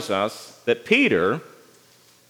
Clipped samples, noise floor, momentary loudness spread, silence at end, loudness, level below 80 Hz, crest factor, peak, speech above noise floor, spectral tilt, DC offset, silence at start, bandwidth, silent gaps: under 0.1%; -55 dBFS; 12 LU; 0.8 s; -22 LUFS; -70 dBFS; 20 dB; -4 dBFS; 33 dB; -4.5 dB/octave; under 0.1%; 0 s; 18 kHz; none